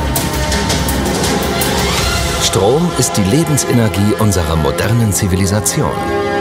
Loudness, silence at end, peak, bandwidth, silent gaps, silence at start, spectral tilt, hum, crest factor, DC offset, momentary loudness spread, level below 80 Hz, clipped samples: -14 LUFS; 0 s; 0 dBFS; 16.5 kHz; none; 0 s; -4.5 dB/octave; none; 12 dB; under 0.1%; 3 LU; -26 dBFS; under 0.1%